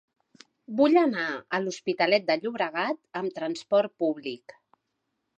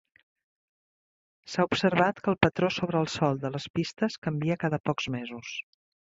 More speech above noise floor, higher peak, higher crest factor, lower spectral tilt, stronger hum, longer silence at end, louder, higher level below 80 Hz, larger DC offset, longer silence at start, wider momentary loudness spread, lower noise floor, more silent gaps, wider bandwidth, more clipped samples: second, 54 dB vs over 62 dB; second, -8 dBFS vs -4 dBFS; second, 20 dB vs 26 dB; about the same, -5 dB/octave vs -6 dB/octave; neither; first, 1 s vs 0.55 s; about the same, -26 LUFS vs -28 LUFS; second, -80 dBFS vs -58 dBFS; neither; second, 0.7 s vs 1.45 s; about the same, 12 LU vs 11 LU; second, -80 dBFS vs under -90 dBFS; second, none vs 3.70-3.74 s, 4.18-4.22 s, 4.80-4.84 s; first, 8.8 kHz vs 7.8 kHz; neither